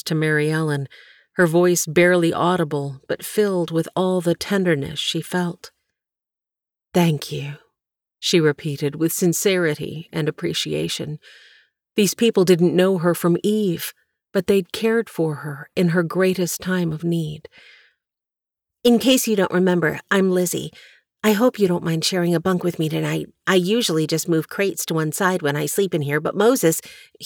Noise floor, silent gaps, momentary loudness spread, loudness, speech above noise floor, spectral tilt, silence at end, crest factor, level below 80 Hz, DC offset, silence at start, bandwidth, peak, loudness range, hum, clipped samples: -90 dBFS; none; 11 LU; -20 LUFS; 70 dB; -5 dB/octave; 0 s; 16 dB; -60 dBFS; under 0.1%; 0.05 s; 20 kHz; -4 dBFS; 4 LU; none; under 0.1%